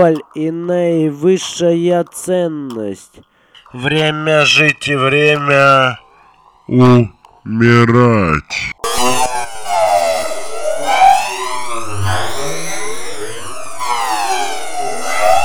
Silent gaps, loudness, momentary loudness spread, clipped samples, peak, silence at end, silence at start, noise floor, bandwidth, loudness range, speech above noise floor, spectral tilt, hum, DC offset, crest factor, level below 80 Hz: none; -14 LUFS; 14 LU; under 0.1%; -2 dBFS; 0 s; 0 s; -47 dBFS; over 20 kHz; 7 LU; 35 dB; -4.5 dB/octave; none; under 0.1%; 14 dB; -44 dBFS